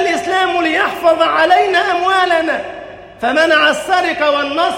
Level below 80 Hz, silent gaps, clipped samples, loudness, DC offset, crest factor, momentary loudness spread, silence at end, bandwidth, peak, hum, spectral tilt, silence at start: -52 dBFS; none; under 0.1%; -13 LUFS; under 0.1%; 12 dB; 10 LU; 0 s; 16.5 kHz; 0 dBFS; none; -2.5 dB/octave; 0 s